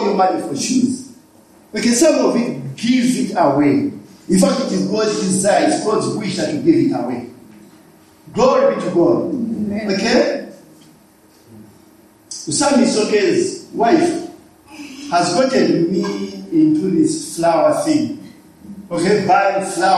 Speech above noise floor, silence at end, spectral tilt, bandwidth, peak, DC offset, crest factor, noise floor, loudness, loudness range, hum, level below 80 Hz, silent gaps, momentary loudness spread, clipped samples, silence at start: 34 dB; 0 s; -4.5 dB/octave; 13.5 kHz; -2 dBFS; under 0.1%; 16 dB; -49 dBFS; -16 LUFS; 3 LU; none; -56 dBFS; none; 13 LU; under 0.1%; 0 s